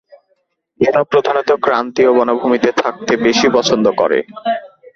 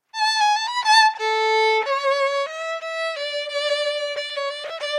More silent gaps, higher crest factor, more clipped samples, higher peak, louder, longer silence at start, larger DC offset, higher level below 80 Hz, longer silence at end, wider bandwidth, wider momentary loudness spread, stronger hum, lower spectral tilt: neither; about the same, 14 dB vs 16 dB; neither; first, 0 dBFS vs -6 dBFS; first, -14 LUFS vs -21 LUFS; first, 0.8 s vs 0.15 s; neither; first, -54 dBFS vs -86 dBFS; first, 0.3 s vs 0 s; second, 7.6 kHz vs 12 kHz; second, 6 LU vs 11 LU; neither; first, -4 dB/octave vs 3.5 dB/octave